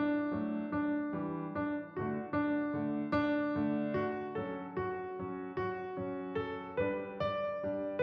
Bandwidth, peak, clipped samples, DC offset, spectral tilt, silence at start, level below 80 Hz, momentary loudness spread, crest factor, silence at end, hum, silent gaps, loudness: 5.4 kHz; -20 dBFS; under 0.1%; under 0.1%; -9 dB/octave; 0 s; -64 dBFS; 6 LU; 16 dB; 0 s; none; none; -36 LUFS